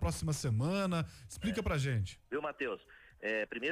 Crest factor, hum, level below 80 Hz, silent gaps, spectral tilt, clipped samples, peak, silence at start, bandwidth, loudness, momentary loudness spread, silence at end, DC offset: 12 dB; none; -50 dBFS; none; -5.5 dB/octave; under 0.1%; -24 dBFS; 0 s; 15.5 kHz; -36 LUFS; 7 LU; 0 s; under 0.1%